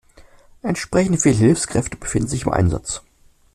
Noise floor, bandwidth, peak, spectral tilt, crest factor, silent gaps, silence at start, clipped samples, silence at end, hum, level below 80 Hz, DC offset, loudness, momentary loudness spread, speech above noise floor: -48 dBFS; 13.5 kHz; -2 dBFS; -5.5 dB/octave; 18 dB; none; 0.65 s; under 0.1%; 0.55 s; none; -38 dBFS; under 0.1%; -19 LUFS; 12 LU; 29 dB